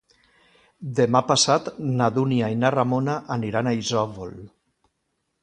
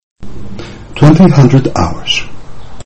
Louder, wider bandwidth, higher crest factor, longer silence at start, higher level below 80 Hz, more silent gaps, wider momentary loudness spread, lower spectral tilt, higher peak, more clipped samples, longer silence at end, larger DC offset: second, -22 LUFS vs -9 LUFS; first, 10.5 kHz vs 8.6 kHz; first, 20 dB vs 10 dB; first, 0.8 s vs 0 s; second, -60 dBFS vs -30 dBFS; second, none vs 0.03-0.16 s; second, 11 LU vs 22 LU; second, -5 dB/octave vs -6.5 dB/octave; second, -4 dBFS vs 0 dBFS; second, under 0.1% vs 1%; first, 0.95 s vs 0 s; neither